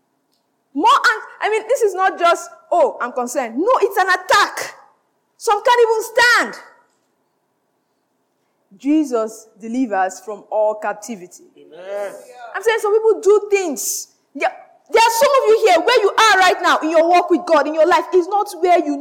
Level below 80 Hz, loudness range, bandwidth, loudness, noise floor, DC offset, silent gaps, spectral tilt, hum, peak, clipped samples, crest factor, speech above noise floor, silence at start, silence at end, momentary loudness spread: -68 dBFS; 10 LU; 17.5 kHz; -16 LUFS; -67 dBFS; under 0.1%; none; -1.5 dB/octave; none; -4 dBFS; under 0.1%; 14 dB; 51 dB; 0.75 s; 0 s; 15 LU